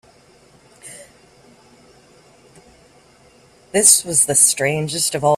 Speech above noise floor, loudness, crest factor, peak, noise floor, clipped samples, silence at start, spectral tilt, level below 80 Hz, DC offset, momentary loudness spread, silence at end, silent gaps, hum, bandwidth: 35 dB; -13 LUFS; 20 dB; 0 dBFS; -51 dBFS; under 0.1%; 0.85 s; -2 dB/octave; -60 dBFS; under 0.1%; 27 LU; 0 s; none; none; 16 kHz